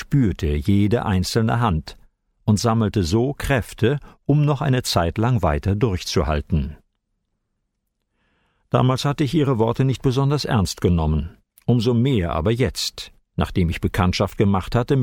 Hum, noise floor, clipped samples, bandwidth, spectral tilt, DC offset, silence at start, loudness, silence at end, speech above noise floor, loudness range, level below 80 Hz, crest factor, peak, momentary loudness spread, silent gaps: none; -75 dBFS; under 0.1%; 16.5 kHz; -6.5 dB/octave; under 0.1%; 0 s; -21 LUFS; 0 s; 55 dB; 4 LU; -34 dBFS; 16 dB; -6 dBFS; 6 LU; none